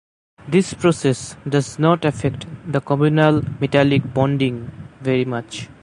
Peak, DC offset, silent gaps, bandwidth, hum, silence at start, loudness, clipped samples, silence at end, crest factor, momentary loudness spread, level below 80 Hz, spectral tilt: 0 dBFS; under 0.1%; none; 11.5 kHz; none; 0.45 s; -19 LUFS; under 0.1%; 0.1 s; 18 dB; 11 LU; -48 dBFS; -6.5 dB/octave